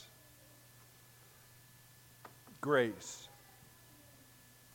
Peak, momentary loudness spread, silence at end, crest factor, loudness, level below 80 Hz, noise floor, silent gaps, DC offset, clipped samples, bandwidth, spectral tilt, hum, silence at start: -18 dBFS; 27 LU; 1.45 s; 26 dB; -36 LUFS; -76 dBFS; -62 dBFS; none; under 0.1%; under 0.1%; 17 kHz; -4.5 dB/octave; none; 0 s